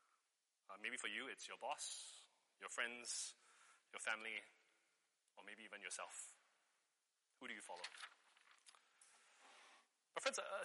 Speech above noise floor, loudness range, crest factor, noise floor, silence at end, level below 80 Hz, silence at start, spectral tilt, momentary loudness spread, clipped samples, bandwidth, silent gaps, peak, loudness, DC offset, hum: 38 dB; 10 LU; 30 dB; -88 dBFS; 0 s; under -90 dBFS; 0.7 s; 1 dB/octave; 23 LU; under 0.1%; 11.5 kHz; none; -22 dBFS; -49 LUFS; under 0.1%; none